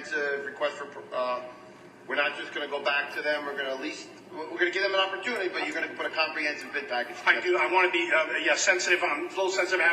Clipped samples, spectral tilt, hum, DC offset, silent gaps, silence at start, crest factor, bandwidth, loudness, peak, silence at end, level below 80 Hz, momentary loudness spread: under 0.1%; -1 dB/octave; none; under 0.1%; none; 0 s; 20 dB; 14 kHz; -27 LUFS; -8 dBFS; 0 s; -78 dBFS; 11 LU